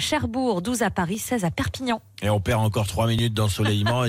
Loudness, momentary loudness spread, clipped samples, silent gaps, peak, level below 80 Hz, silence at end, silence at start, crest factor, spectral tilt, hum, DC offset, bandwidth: -24 LUFS; 4 LU; under 0.1%; none; -12 dBFS; -44 dBFS; 0 s; 0 s; 12 dB; -5 dB/octave; none; under 0.1%; 16 kHz